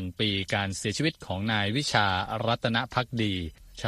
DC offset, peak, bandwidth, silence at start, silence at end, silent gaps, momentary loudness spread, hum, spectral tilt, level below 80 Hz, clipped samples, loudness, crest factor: under 0.1%; -8 dBFS; 13.5 kHz; 0 s; 0 s; none; 5 LU; none; -4.5 dB/octave; -52 dBFS; under 0.1%; -28 LUFS; 20 dB